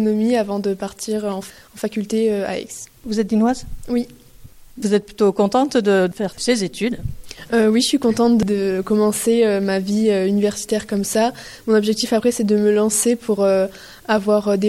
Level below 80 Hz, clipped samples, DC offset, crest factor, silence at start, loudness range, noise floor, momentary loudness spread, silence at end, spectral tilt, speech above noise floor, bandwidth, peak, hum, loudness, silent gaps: -46 dBFS; under 0.1%; under 0.1%; 16 dB; 0 s; 5 LU; -42 dBFS; 11 LU; 0 s; -4.5 dB/octave; 24 dB; 15.5 kHz; -4 dBFS; none; -19 LUFS; none